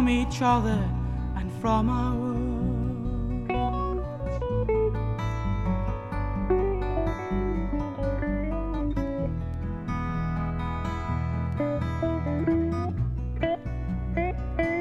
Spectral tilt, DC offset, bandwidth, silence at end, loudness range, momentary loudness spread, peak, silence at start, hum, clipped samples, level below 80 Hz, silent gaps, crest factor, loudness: -8 dB/octave; under 0.1%; 9.4 kHz; 0 s; 2 LU; 7 LU; -10 dBFS; 0 s; none; under 0.1%; -32 dBFS; none; 16 dB; -28 LUFS